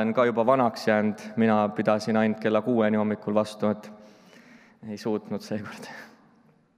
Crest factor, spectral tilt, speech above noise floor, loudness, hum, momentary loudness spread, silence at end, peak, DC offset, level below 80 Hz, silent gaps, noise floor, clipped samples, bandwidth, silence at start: 18 dB; -6.5 dB/octave; 35 dB; -25 LUFS; none; 17 LU; 0.7 s; -8 dBFS; under 0.1%; -78 dBFS; none; -60 dBFS; under 0.1%; 12 kHz; 0 s